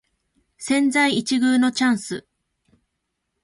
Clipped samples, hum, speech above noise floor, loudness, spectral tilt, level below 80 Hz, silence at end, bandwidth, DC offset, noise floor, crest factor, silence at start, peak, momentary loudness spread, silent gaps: under 0.1%; none; 58 dB; -20 LUFS; -3.5 dB/octave; -66 dBFS; 1.25 s; 11.5 kHz; under 0.1%; -77 dBFS; 14 dB; 0.6 s; -8 dBFS; 15 LU; none